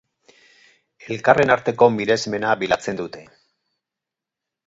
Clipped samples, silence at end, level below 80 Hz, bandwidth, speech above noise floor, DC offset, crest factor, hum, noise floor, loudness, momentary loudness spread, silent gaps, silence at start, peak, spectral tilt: under 0.1%; 1.45 s; -56 dBFS; 8 kHz; 67 dB; under 0.1%; 22 dB; none; -86 dBFS; -19 LUFS; 15 LU; none; 1.05 s; 0 dBFS; -5 dB/octave